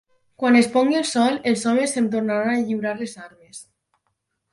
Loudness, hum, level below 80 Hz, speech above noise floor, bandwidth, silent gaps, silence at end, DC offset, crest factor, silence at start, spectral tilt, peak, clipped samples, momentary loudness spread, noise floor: -20 LUFS; none; -68 dBFS; 54 dB; 11.5 kHz; none; 0.9 s; under 0.1%; 18 dB; 0.4 s; -4 dB/octave; -4 dBFS; under 0.1%; 23 LU; -74 dBFS